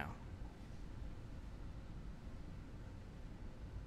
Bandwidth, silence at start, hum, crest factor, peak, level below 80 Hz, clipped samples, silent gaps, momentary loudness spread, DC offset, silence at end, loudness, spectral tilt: 13 kHz; 0 s; none; 22 dB; -28 dBFS; -52 dBFS; under 0.1%; none; 2 LU; under 0.1%; 0 s; -54 LUFS; -7 dB/octave